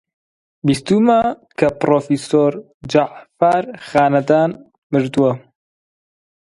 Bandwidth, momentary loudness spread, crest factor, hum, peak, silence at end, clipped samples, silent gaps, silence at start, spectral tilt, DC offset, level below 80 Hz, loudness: 11.5 kHz; 8 LU; 16 dB; none; 0 dBFS; 1.1 s; under 0.1%; 2.74-2.80 s, 4.78-4.90 s; 0.65 s; -6.5 dB/octave; under 0.1%; -54 dBFS; -17 LUFS